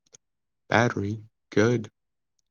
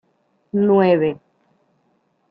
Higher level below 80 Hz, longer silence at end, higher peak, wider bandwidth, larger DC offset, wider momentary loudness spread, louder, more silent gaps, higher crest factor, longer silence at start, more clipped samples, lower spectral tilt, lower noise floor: second, -70 dBFS vs -64 dBFS; second, 0.6 s vs 1.15 s; about the same, -4 dBFS vs -4 dBFS; first, 7.2 kHz vs 4.9 kHz; neither; about the same, 13 LU vs 12 LU; second, -25 LUFS vs -17 LUFS; neither; first, 24 dB vs 18 dB; first, 0.7 s vs 0.55 s; neither; second, -6 dB/octave vs -11 dB/octave; first, -88 dBFS vs -65 dBFS